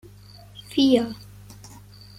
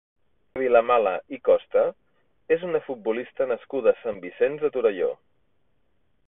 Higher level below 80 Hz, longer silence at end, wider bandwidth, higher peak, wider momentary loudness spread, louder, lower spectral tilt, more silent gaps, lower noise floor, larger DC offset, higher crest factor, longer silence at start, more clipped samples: first, -54 dBFS vs -68 dBFS; second, 0.5 s vs 1.15 s; first, 15 kHz vs 3.8 kHz; about the same, -6 dBFS vs -4 dBFS; first, 26 LU vs 8 LU; about the same, -22 LUFS vs -24 LUFS; second, -5.5 dB/octave vs -9.5 dB/octave; neither; second, -46 dBFS vs -72 dBFS; neither; about the same, 20 dB vs 20 dB; about the same, 0.55 s vs 0.55 s; neither